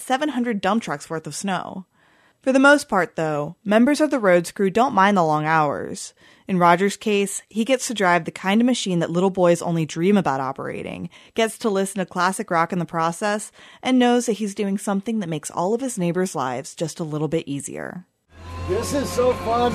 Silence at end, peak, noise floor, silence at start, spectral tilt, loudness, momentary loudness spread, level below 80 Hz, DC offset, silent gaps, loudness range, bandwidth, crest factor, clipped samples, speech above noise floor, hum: 0 s; -2 dBFS; -58 dBFS; 0 s; -5 dB/octave; -21 LUFS; 12 LU; -54 dBFS; under 0.1%; none; 6 LU; 13.5 kHz; 20 dB; under 0.1%; 37 dB; none